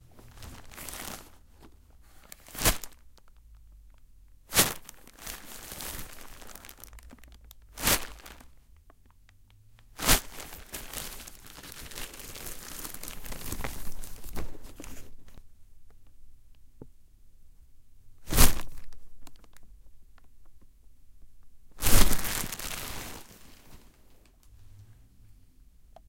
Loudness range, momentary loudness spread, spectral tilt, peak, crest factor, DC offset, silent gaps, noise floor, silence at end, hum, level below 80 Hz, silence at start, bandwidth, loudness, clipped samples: 12 LU; 27 LU; -2.5 dB/octave; -2 dBFS; 28 dB; under 0.1%; none; -57 dBFS; 1.15 s; none; -38 dBFS; 0.15 s; 17 kHz; -31 LUFS; under 0.1%